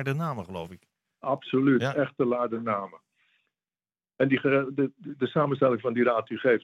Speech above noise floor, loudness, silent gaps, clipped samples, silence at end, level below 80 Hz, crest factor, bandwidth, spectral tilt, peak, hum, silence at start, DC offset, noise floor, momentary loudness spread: over 64 dB; -27 LUFS; none; under 0.1%; 0.05 s; -76 dBFS; 18 dB; 12.5 kHz; -8 dB/octave; -10 dBFS; none; 0 s; under 0.1%; under -90 dBFS; 12 LU